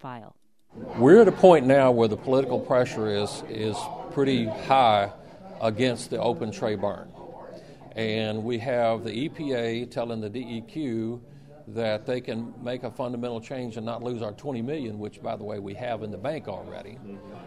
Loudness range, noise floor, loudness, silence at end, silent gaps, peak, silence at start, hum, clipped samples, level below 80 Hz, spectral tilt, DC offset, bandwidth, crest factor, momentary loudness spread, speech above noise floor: 13 LU; -45 dBFS; -25 LUFS; 0 s; none; -2 dBFS; 0.05 s; none; under 0.1%; -60 dBFS; -6.5 dB/octave; 0.1%; 12 kHz; 24 dB; 21 LU; 20 dB